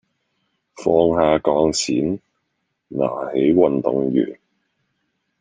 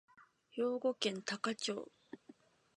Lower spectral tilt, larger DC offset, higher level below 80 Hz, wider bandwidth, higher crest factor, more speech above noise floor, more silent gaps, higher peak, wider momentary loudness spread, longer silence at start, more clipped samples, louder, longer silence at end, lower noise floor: first, -5.5 dB/octave vs -3.5 dB/octave; neither; first, -52 dBFS vs -90 dBFS; second, 9.6 kHz vs 11 kHz; second, 18 dB vs 24 dB; first, 56 dB vs 26 dB; neither; first, -2 dBFS vs -18 dBFS; second, 10 LU vs 20 LU; first, 0.75 s vs 0.2 s; neither; first, -19 LUFS vs -39 LUFS; first, 1.05 s vs 0.45 s; first, -74 dBFS vs -64 dBFS